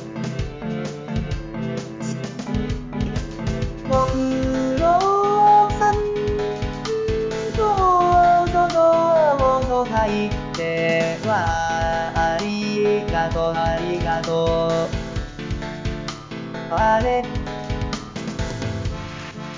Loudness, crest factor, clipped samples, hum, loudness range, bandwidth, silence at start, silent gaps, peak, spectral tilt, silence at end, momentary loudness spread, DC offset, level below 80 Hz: -21 LUFS; 14 dB; under 0.1%; none; 7 LU; 7.6 kHz; 0 s; none; -6 dBFS; -6 dB/octave; 0 s; 13 LU; under 0.1%; -34 dBFS